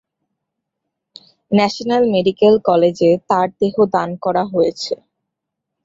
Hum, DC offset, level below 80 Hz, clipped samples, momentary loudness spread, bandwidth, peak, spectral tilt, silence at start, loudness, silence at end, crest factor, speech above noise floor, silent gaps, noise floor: none; under 0.1%; -58 dBFS; under 0.1%; 6 LU; 7.8 kHz; -2 dBFS; -6.5 dB/octave; 1.5 s; -16 LUFS; 0.9 s; 16 dB; 64 dB; none; -79 dBFS